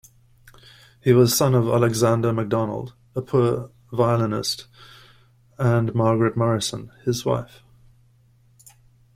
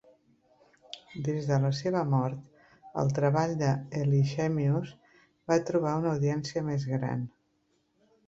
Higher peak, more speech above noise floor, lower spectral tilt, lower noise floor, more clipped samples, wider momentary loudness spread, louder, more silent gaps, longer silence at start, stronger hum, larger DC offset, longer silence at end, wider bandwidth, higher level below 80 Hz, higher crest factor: first, -4 dBFS vs -12 dBFS; second, 36 dB vs 45 dB; second, -6 dB/octave vs -7.5 dB/octave; second, -57 dBFS vs -73 dBFS; neither; about the same, 13 LU vs 15 LU; first, -22 LUFS vs -29 LUFS; neither; about the same, 1.05 s vs 0.95 s; neither; neither; first, 1.7 s vs 1 s; first, 16 kHz vs 7.6 kHz; first, -54 dBFS vs -64 dBFS; about the same, 18 dB vs 18 dB